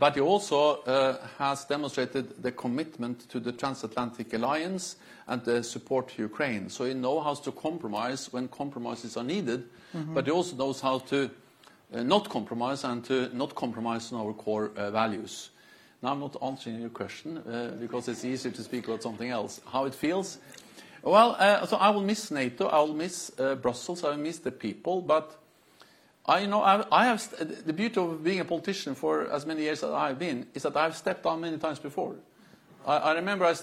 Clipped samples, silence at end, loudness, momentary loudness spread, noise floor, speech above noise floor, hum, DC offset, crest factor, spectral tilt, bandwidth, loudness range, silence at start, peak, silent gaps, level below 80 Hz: under 0.1%; 0 s; -29 LUFS; 12 LU; -59 dBFS; 30 dB; none; under 0.1%; 22 dB; -4.5 dB/octave; 15.5 kHz; 8 LU; 0 s; -6 dBFS; none; -74 dBFS